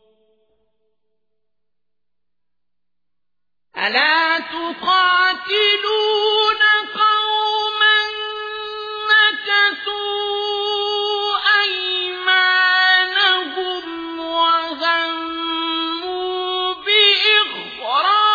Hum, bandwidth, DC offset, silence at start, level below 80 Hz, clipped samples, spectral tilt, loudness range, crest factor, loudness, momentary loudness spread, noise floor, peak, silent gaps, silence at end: 60 Hz at -80 dBFS; 5 kHz; under 0.1%; 3.75 s; -64 dBFS; under 0.1%; -1.5 dB/octave; 5 LU; 18 dB; -16 LUFS; 11 LU; -86 dBFS; 0 dBFS; none; 0 s